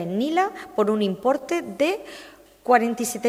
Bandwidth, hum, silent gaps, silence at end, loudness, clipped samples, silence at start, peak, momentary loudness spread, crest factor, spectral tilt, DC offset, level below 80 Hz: 16 kHz; none; none; 0 s; -23 LUFS; under 0.1%; 0 s; -4 dBFS; 13 LU; 20 dB; -4.5 dB/octave; under 0.1%; -64 dBFS